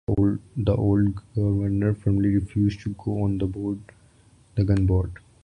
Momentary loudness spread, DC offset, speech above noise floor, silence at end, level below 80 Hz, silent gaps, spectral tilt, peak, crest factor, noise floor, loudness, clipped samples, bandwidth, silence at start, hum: 9 LU; under 0.1%; 33 dB; 0.3 s; -38 dBFS; none; -10 dB/octave; -8 dBFS; 16 dB; -55 dBFS; -24 LUFS; under 0.1%; 9.6 kHz; 0.1 s; none